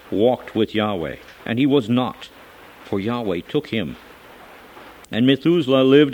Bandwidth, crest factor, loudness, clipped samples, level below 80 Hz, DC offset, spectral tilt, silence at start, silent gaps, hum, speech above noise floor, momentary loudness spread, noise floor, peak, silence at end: 17 kHz; 20 dB; -20 LUFS; under 0.1%; -54 dBFS; under 0.1%; -7.5 dB/octave; 0.1 s; none; none; 25 dB; 16 LU; -43 dBFS; -2 dBFS; 0 s